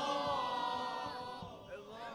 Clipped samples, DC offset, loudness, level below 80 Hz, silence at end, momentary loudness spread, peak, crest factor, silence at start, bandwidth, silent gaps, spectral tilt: under 0.1%; under 0.1%; -40 LUFS; -70 dBFS; 0 s; 13 LU; -24 dBFS; 16 dB; 0 s; over 20 kHz; none; -4 dB/octave